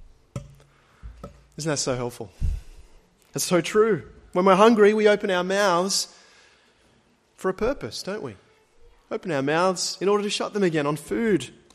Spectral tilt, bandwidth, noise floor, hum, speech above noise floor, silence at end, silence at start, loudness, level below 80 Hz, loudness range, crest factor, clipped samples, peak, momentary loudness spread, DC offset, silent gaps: -4.5 dB/octave; 14 kHz; -62 dBFS; none; 39 dB; 0.25 s; 0 s; -23 LUFS; -42 dBFS; 12 LU; 22 dB; under 0.1%; -2 dBFS; 19 LU; under 0.1%; none